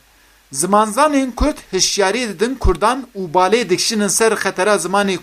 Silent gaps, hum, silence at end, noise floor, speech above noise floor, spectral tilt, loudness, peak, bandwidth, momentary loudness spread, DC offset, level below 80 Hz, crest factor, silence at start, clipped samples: none; none; 0 s; -51 dBFS; 35 dB; -3 dB/octave; -16 LUFS; 0 dBFS; 15.5 kHz; 6 LU; under 0.1%; -30 dBFS; 16 dB; 0.5 s; under 0.1%